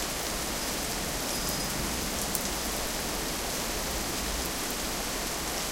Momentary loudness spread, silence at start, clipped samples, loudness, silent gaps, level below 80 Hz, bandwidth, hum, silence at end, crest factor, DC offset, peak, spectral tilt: 1 LU; 0 s; under 0.1%; -30 LUFS; none; -42 dBFS; 17 kHz; none; 0 s; 30 dB; under 0.1%; -2 dBFS; -2 dB/octave